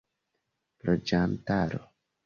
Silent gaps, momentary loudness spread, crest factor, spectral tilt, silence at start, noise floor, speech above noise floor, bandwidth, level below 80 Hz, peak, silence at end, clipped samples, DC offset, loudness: none; 9 LU; 18 dB; -7 dB/octave; 0.85 s; -81 dBFS; 53 dB; 7 kHz; -52 dBFS; -12 dBFS; 0.4 s; under 0.1%; under 0.1%; -29 LUFS